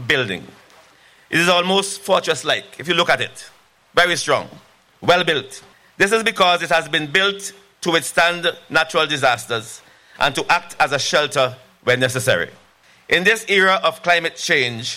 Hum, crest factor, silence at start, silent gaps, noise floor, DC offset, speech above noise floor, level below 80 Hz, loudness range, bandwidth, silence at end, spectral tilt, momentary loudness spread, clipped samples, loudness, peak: none; 16 dB; 0 s; none; -51 dBFS; under 0.1%; 32 dB; -56 dBFS; 2 LU; 16.5 kHz; 0 s; -3 dB/octave; 10 LU; under 0.1%; -17 LUFS; -4 dBFS